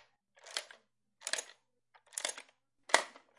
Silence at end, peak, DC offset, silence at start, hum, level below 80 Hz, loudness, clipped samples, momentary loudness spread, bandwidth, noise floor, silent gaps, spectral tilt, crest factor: 0.3 s; -8 dBFS; under 0.1%; 0.45 s; none; under -90 dBFS; -37 LUFS; under 0.1%; 24 LU; 11.5 kHz; -71 dBFS; none; 2 dB/octave; 32 dB